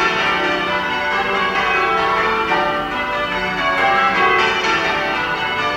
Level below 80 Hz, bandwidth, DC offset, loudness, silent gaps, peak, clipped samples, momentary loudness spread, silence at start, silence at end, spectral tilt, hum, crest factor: -44 dBFS; 16.5 kHz; under 0.1%; -16 LUFS; none; -2 dBFS; under 0.1%; 5 LU; 0 s; 0 s; -3.5 dB/octave; none; 14 dB